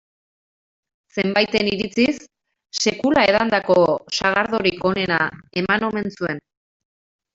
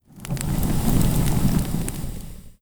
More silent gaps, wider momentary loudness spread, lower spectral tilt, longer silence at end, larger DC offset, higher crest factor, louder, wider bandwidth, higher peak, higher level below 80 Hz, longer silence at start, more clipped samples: neither; second, 10 LU vs 14 LU; second, -4 dB/octave vs -6 dB/octave; first, 0.95 s vs 0.1 s; neither; about the same, 18 dB vs 16 dB; first, -19 LUFS vs -24 LUFS; second, 8 kHz vs over 20 kHz; about the same, -2 dBFS vs -4 dBFS; second, -54 dBFS vs -28 dBFS; first, 1.15 s vs 0.15 s; neither